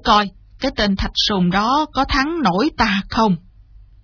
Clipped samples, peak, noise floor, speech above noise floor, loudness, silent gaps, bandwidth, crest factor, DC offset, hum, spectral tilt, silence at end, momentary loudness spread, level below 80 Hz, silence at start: under 0.1%; 0 dBFS; -45 dBFS; 28 dB; -18 LUFS; none; 5.4 kHz; 18 dB; under 0.1%; none; -5 dB/octave; 0.65 s; 7 LU; -34 dBFS; 0.05 s